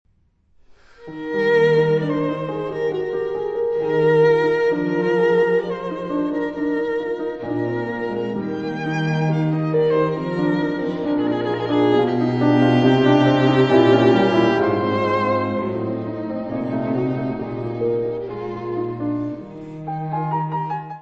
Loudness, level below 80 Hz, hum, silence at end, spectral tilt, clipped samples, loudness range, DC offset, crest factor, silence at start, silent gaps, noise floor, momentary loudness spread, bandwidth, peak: -20 LUFS; -54 dBFS; none; 0 s; -8 dB/octave; under 0.1%; 9 LU; under 0.1%; 18 dB; 1 s; none; -60 dBFS; 11 LU; 7.6 kHz; -2 dBFS